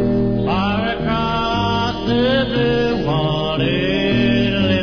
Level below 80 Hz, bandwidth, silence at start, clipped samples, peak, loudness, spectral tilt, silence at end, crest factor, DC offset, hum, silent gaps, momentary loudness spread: -34 dBFS; 5.4 kHz; 0 s; under 0.1%; -6 dBFS; -18 LUFS; -7 dB/octave; 0 s; 12 dB; under 0.1%; none; none; 3 LU